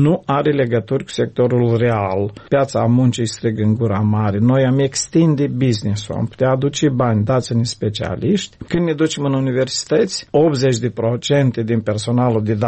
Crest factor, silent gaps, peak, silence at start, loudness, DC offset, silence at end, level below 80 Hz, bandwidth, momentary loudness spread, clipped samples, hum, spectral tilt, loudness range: 12 dB; none; -4 dBFS; 0 s; -17 LUFS; under 0.1%; 0 s; -48 dBFS; 8.8 kHz; 6 LU; under 0.1%; none; -6 dB/octave; 2 LU